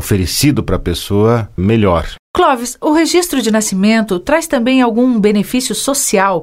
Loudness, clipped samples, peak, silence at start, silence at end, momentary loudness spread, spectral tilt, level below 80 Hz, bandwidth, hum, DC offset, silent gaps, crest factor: -13 LUFS; under 0.1%; 0 dBFS; 0 s; 0 s; 5 LU; -4.5 dB/octave; -32 dBFS; 16.5 kHz; none; under 0.1%; 2.19-2.34 s; 12 dB